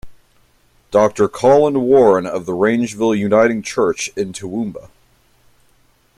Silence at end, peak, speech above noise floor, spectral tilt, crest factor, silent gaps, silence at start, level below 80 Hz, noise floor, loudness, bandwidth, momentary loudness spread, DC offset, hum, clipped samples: 1.3 s; -2 dBFS; 41 dB; -5.5 dB/octave; 16 dB; none; 0.05 s; -52 dBFS; -56 dBFS; -16 LUFS; 13 kHz; 12 LU; under 0.1%; none; under 0.1%